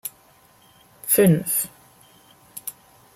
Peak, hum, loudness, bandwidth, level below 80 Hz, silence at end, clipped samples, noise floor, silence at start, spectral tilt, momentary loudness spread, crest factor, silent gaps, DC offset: -6 dBFS; none; -19 LUFS; 16 kHz; -64 dBFS; 0.45 s; under 0.1%; -55 dBFS; 0.05 s; -5 dB/octave; 19 LU; 20 dB; none; under 0.1%